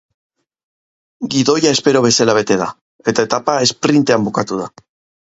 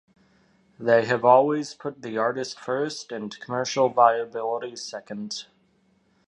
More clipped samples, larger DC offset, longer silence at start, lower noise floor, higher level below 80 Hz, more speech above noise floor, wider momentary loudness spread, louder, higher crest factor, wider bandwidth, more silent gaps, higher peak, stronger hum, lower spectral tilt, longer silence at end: neither; neither; first, 1.2 s vs 0.8 s; first, under -90 dBFS vs -65 dBFS; first, -56 dBFS vs -72 dBFS; first, over 76 dB vs 41 dB; second, 11 LU vs 16 LU; first, -15 LUFS vs -24 LUFS; second, 16 dB vs 22 dB; second, 8 kHz vs 11 kHz; first, 2.81-2.99 s vs none; about the same, 0 dBFS vs -2 dBFS; neither; about the same, -4 dB/octave vs -4.5 dB/octave; second, 0.55 s vs 0.85 s